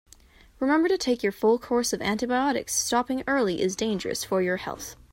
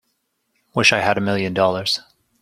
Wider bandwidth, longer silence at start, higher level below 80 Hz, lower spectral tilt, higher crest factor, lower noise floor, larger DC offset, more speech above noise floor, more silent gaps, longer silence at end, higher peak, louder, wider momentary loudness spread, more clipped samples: about the same, 16.5 kHz vs 16 kHz; second, 0.6 s vs 0.75 s; about the same, -56 dBFS vs -58 dBFS; about the same, -3.5 dB/octave vs -4 dB/octave; about the same, 16 dB vs 20 dB; second, -54 dBFS vs -71 dBFS; neither; second, 29 dB vs 52 dB; neither; second, 0.2 s vs 0.4 s; second, -10 dBFS vs 0 dBFS; second, -25 LUFS vs -18 LUFS; second, 6 LU vs 9 LU; neither